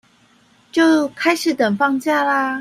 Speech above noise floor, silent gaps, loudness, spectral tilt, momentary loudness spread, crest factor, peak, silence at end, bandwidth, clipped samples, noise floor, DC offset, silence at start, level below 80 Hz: 38 dB; none; -17 LUFS; -4 dB/octave; 3 LU; 16 dB; -2 dBFS; 0 s; 15.5 kHz; under 0.1%; -54 dBFS; under 0.1%; 0.75 s; -66 dBFS